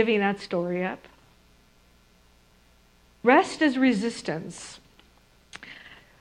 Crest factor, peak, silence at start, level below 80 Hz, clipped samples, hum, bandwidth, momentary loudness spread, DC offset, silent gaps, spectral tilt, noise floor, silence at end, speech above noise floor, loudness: 24 dB; -4 dBFS; 0 s; -62 dBFS; under 0.1%; 60 Hz at -60 dBFS; 11 kHz; 23 LU; under 0.1%; none; -5 dB/octave; -59 dBFS; 0.25 s; 35 dB; -24 LUFS